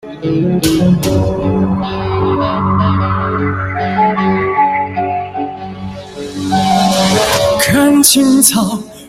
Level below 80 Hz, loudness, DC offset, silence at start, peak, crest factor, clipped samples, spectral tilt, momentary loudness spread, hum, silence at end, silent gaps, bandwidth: -36 dBFS; -12 LUFS; under 0.1%; 0.05 s; 0 dBFS; 12 dB; under 0.1%; -4.5 dB/octave; 14 LU; none; 0 s; none; 16 kHz